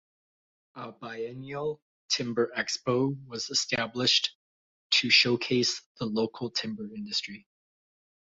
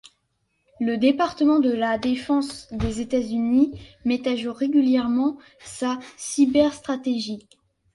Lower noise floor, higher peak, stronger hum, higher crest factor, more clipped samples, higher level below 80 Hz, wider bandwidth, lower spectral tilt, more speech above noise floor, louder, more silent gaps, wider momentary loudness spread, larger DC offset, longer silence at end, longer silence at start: first, under -90 dBFS vs -72 dBFS; about the same, -8 dBFS vs -6 dBFS; neither; first, 22 dB vs 16 dB; neither; second, -68 dBFS vs -46 dBFS; second, 8 kHz vs 11.5 kHz; second, -3 dB/octave vs -5 dB/octave; first, over 61 dB vs 50 dB; second, -27 LUFS vs -23 LUFS; first, 1.82-2.09 s, 4.35-4.90 s, 5.86-5.95 s vs none; first, 18 LU vs 10 LU; neither; first, 0.85 s vs 0.55 s; about the same, 0.75 s vs 0.8 s